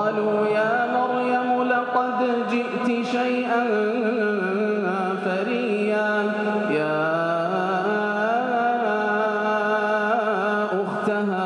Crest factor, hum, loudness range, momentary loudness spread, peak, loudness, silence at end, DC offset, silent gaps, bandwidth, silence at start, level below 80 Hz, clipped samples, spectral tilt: 14 dB; none; 1 LU; 2 LU; -8 dBFS; -22 LUFS; 0 s; under 0.1%; none; 10.5 kHz; 0 s; -76 dBFS; under 0.1%; -6.5 dB/octave